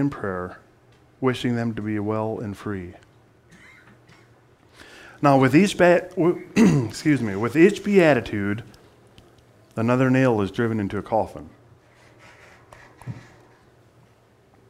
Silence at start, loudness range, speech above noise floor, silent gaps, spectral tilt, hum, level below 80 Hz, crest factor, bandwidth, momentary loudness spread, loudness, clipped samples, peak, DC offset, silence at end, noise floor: 0 s; 12 LU; 36 dB; none; -7 dB/octave; none; -54 dBFS; 20 dB; 15.5 kHz; 18 LU; -21 LUFS; under 0.1%; -2 dBFS; under 0.1%; 1.5 s; -56 dBFS